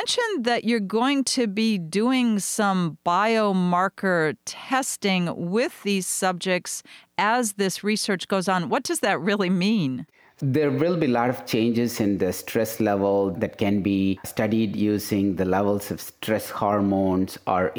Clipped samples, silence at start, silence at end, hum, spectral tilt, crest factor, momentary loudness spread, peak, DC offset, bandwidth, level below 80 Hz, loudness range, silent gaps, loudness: under 0.1%; 0 s; 0 s; none; -4.5 dB/octave; 14 dB; 5 LU; -8 dBFS; under 0.1%; over 20 kHz; -62 dBFS; 2 LU; none; -23 LUFS